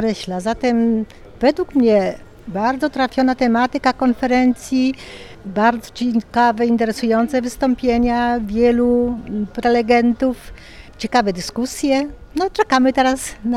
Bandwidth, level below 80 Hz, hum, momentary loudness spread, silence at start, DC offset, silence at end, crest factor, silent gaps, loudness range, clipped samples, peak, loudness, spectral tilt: 13.5 kHz; -40 dBFS; none; 9 LU; 0 s; under 0.1%; 0 s; 16 dB; none; 2 LU; under 0.1%; -2 dBFS; -18 LUFS; -5 dB/octave